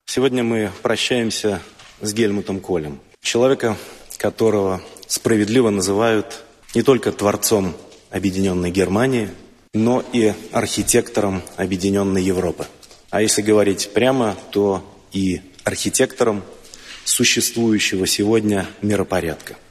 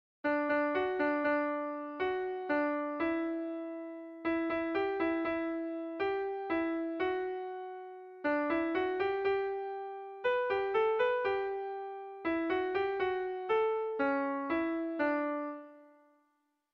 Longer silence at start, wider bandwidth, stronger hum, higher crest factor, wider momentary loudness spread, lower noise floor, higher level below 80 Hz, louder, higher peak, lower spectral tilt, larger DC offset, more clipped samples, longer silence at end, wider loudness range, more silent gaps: second, 0.1 s vs 0.25 s; first, 13.5 kHz vs 6 kHz; neither; about the same, 18 dB vs 14 dB; about the same, 11 LU vs 10 LU; second, -39 dBFS vs -78 dBFS; first, -50 dBFS vs -70 dBFS; first, -19 LUFS vs -34 LUFS; first, -2 dBFS vs -20 dBFS; first, -4 dB/octave vs -2.5 dB/octave; neither; neither; second, 0.15 s vs 0.85 s; about the same, 2 LU vs 2 LU; neither